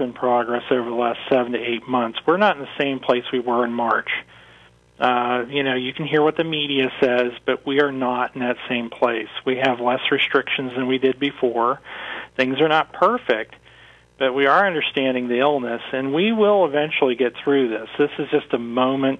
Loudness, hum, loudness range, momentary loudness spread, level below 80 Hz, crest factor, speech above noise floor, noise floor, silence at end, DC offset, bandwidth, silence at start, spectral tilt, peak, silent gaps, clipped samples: -20 LUFS; none; 2 LU; 7 LU; -62 dBFS; 18 dB; 31 dB; -51 dBFS; 0 s; under 0.1%; 7.6 kHz; 0 s; -6.5 dB/octave; -4 dBFS; none; under 0.1%